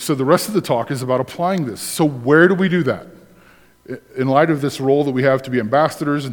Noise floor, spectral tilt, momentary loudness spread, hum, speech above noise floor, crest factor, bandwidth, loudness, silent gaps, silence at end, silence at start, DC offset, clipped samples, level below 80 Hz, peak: -49 dBFS; -6 dB/octave; 9 LU; none; 32 dB; 18 dB; 19 kHz; -17 LUFS; none; 0 s; 0 s; under 0.1%; under 0.1%; -60 dBFS; 0 dBFS